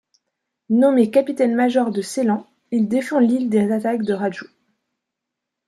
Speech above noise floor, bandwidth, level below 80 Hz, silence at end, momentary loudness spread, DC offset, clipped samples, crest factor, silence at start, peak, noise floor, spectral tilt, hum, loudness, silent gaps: 64 dB; 12.5 kHz; -68 dBFS; 1.25 s; 8 LU; under 0.1%; under 0.1%; 16 dB; 0.7 s; -4 dBFS; -82 dBFS; -6.5 dB/octave; none; -19 LUFS; none